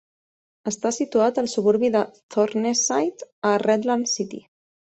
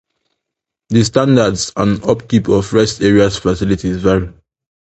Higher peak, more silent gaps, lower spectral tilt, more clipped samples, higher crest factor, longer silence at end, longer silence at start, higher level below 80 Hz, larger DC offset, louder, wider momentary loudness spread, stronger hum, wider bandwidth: second, -6 dBFS vs 0 dBFS; first, 2.23-2.29 s, 3.32-3.42 s vs none; second, -3.5 dB/octave vs -6 dB/octave; neither; about the same, 16 dB vs 14 dB; about the same, 0.55 s vs 0.55 s; second, 0.65 s vs 0.9 s; second, -68 dBFS vs -36 dBFS; neither; second, -22 LUFS vs -14 LUFS; first, 8 LU vs 5 LU; neither; about the same, 8.4 kHz vs 8.8 kHz